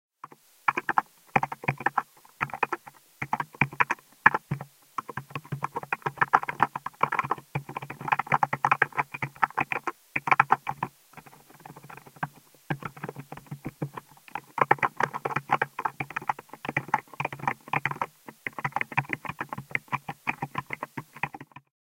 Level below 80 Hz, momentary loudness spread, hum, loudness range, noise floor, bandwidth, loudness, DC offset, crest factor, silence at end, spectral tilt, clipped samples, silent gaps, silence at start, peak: -64 dBFS; 15 LU; none; 6 LU; -52 dBFS; 17 kHz; -29 LUFS; under 0.1%; 30 dB; 0.55 s; -5.5 dB/octave; under 0.1%; none; 0.25 s; 0 dBFS